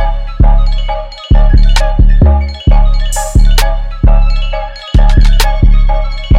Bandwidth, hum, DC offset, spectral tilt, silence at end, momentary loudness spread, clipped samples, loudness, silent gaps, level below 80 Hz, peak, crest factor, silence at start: 13 kHz; none; under 0.1%; -5.5 dB/octave; 0 s; 8 LU; 0.2%; -12 LUFS; none; -8 dBFS; 0 dBFS; 6 dB; 0 s